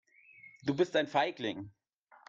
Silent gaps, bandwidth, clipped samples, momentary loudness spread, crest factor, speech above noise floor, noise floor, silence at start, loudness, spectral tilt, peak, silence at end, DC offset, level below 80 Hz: none; 7.6 kHz; under 0.1%; 14 LU; 20 dB; 26 dB; -58 dBFS; 0.45 s; -33 LUFS; -5.5 dB/octave; -16 dBFS; 0.6 s; under 0.1%; -74 dBFS